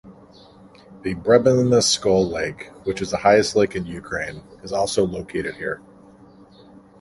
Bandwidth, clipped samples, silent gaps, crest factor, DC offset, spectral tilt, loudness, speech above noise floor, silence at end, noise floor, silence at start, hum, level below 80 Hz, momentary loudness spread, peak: 11.5 kHz; under 0.1%; none; 20 dB; under 0.1%; -4.5 dB/octave; -21 LUFS; 28 dB; 1.25 s; -48 dBFS; 0.05 s; none; -48 dBFS; 14 LU; -2 dBFS